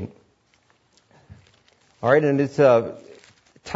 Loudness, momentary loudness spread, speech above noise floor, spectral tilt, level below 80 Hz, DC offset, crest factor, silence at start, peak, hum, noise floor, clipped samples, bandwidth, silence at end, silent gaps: -19 LUFS; 24 LU; 45 dB; -7.5 dB/octave; -64 dBFS; under 0.1%; 20 dB; 0 s; -4 dBFS; none; -63 dBFS; under 0.1%; 8 kHz; 0 s; none